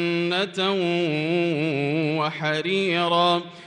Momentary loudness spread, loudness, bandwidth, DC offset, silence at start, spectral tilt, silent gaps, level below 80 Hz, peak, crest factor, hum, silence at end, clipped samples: 4 LU; -23 LUFS; 10 kHz; under 0.1%; 0 s; -6 dB/octave; none; -72 dBFS; -8 dBFS; 16 dB; none; 0 s; under 0.1%